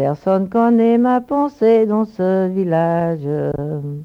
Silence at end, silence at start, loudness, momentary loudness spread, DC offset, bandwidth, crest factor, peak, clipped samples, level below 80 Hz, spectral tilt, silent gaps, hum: 0 s; 0 s; -17 LUFS; 8 LU; under 0.1%; 5.8 kHz; 12 dB; -4 dBFS; under 0.1%; -52 dBFS; -10 dB/octave; none; none